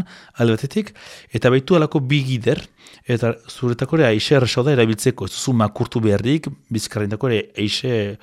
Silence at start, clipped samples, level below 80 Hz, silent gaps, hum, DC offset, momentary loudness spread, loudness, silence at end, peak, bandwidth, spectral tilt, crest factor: 0 s; under 0.1%; -52 dBFS; none; none; under 0.1%; 9 LU; -19 LUFS; 0.05 s; -4 dBFS; 14.5 kHz; -6 dB/octave; 16 dB